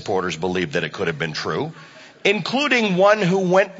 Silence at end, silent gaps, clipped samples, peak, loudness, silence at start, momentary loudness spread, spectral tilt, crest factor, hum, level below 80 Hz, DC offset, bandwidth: 0 s; none; under 0.1%; -2 dBFS; -20 LUFS; 0 s; 9 LU; -5 dB/octave; 18 dB; none; -54 dBFS; under 0.1%; 8 kHz